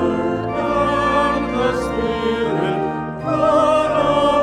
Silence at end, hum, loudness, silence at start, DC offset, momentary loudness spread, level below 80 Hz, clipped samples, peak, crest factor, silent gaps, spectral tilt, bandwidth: 0 s; none; -18 LUFS; 0 s; under 0.1%; 6 LU; -38 dBFS; under 0.1%; -4 dBFS; 14 dB; none; -6 dB/octave; 11.5 kHz